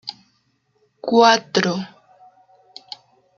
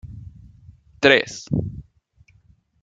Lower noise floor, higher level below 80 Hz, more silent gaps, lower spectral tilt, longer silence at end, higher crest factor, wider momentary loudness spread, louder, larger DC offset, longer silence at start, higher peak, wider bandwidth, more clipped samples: first, -66 dBFS vs -58 dBFS; second, -68 dBFS vs -46 dBFS; neither; about the same, -4 dB/octave vs -4.5 dB/octave; first, 1.5 s vs 1 s; about the same, 20 dB vs 24 dB; about the same, 24 LU vs 25 LU; about the same, -17 LUFS vs -19 LUFS; neither; about the same, 0.05 s vs 0.05 s; about the same, -2 dBFS vs 0 dBFS; about the same, 7.6 kHz vs 7.8 kHz; neither